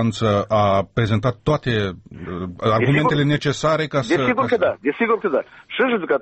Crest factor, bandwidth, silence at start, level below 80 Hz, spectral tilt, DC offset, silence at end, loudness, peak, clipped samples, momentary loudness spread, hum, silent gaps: 12 dB; 8.4 kHz; 0 s; -46 dBFS; -6.5 dB/octave; under 0.1%; 0 s; -20 LUFS; -6 dBFS; under 0.1%; 8 LU; none; none